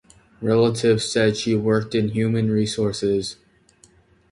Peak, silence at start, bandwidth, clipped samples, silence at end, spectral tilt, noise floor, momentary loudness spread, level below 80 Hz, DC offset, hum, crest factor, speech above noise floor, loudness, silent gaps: -6 dBFS; 0.4 s; 11.5 kHz; under 0.1%; 1 s; -5.5 dB/octave; -56 dBFS; 5 LU; -52 dBFS; under 0.1%; none; 16 dB; 36 dB; -21 LUFS; none